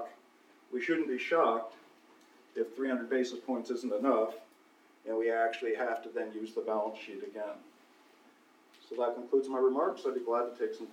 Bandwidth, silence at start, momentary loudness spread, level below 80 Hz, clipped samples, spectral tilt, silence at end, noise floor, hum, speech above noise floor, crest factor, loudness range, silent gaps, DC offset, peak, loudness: 13 kHz; 0 s; 14 LU; under -90 dBFS; under 0.1%; -4.5 dB/octave; 0 s; -64 dBFS; none; 31 dB; 20 dB; 5 LU; none; under 0.1%; -16 dBFS; -33 LUFS